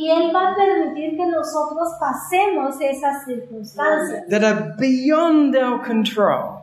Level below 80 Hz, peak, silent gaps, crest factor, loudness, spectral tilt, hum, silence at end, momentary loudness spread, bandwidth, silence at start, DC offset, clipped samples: -64 dBFS; -4 dBFS; none; 16 dB; -19 LUFS; -5 dB/octave; none; 0 s; 8 LU; 13.5 kHz; 0 s; under 0.1%; under 0.1%